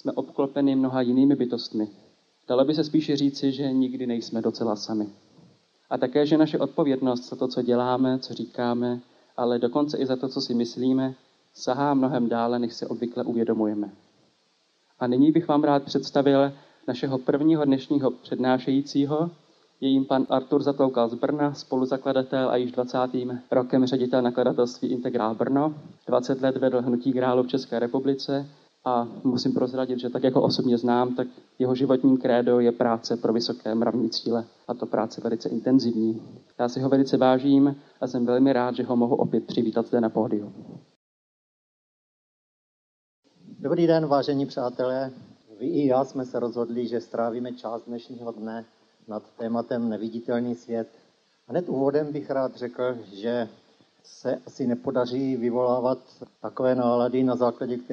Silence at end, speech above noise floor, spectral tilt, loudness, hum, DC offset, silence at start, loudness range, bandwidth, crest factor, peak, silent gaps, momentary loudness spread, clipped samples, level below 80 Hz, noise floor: 0 s; 43 dB; -7 dB/octave; -25 LUFS; none; under 0.1%; 0.05 s; 6 LU; 7 kHz; 18 dB; -6 dBFS; 40.96-43.23 s; 11 LU; under 0.1%; -74 dBFS; -67 dBFS